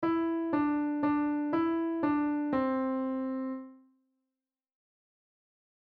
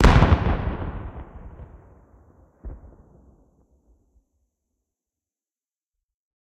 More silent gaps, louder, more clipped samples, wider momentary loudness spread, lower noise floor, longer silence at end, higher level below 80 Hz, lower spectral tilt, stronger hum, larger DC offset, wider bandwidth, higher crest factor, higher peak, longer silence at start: neither; second, -31 LUFS vs -22 LUFS; neither; second, 5 LU vs 28 LU; about the same, under -90 dBFS vs under -90 dBFS; second, 2.15 s vs 3.8 s; second, -66 dBFS vs -30 dBFS; first, -9 dB/octave vs -7 dB/octave; neither; neither; second, 4.6 kHz vs 10.5 kHz; second, 14 dB vs 24 dB; second, -18 dBFS vs -2 dBFS; about the same, 0 s vs 0 s